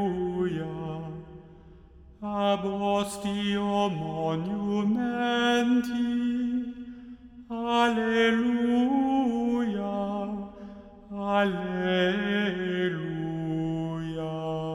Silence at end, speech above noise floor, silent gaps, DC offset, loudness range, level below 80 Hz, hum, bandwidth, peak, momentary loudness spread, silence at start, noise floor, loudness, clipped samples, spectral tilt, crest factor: 0 s; 25 dB; none; under 0.1%; 4 LU; -56 dBFS; none; 12.5 kHz; -12 dBFS; 15 LU; 0 s; -51 dBFS; -28 LUFS; under 0.1%; -6 dB/octave; 16 dB